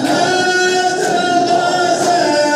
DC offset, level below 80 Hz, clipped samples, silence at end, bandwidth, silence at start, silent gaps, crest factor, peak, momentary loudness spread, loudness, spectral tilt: under 0.1%; -66 dBFS; under 0.1%; 0 s; 14 kHz; 0 s; none; 12 dB; -2 dBFS; 2 LU; -13 LUFS; -3 dB/octave